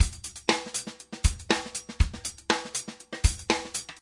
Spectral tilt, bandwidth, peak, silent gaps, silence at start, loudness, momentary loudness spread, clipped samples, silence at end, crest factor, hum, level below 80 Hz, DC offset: -3.5 dB/octave; 11.5 kHz; -6 dBFS; none; 0 s; -29 LUFS; 8 LU; under 0.1%; 0.05 s; 22 dB; none; -34 dBFS; under 0.1%